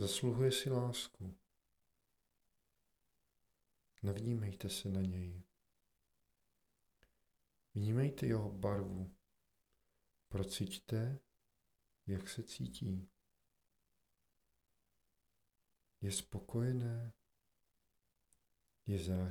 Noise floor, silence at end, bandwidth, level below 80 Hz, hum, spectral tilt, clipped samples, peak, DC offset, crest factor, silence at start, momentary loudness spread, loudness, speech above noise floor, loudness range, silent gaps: -85 dBFS; 0 s; 17 kHz; -66 dBFS; none; -5.5 dB/octave; under 0.1%; -24 dBFS; under 0.1%; 20 dB; 0 s; 13 LU; -41 LUFS; 45 dB; 8 LU; none